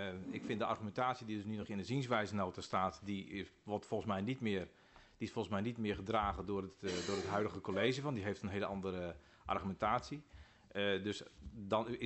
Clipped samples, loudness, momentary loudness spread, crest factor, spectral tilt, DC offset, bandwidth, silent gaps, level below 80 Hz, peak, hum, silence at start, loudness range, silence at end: under 0.1%; -40 LUFS; 10 LU; 20 dB; -5.5 dB/octave; under 0.1%; 8.2 kHz; none; -62 dBFS; -20 dBFS; none; 0 s; 2 LU; 0 s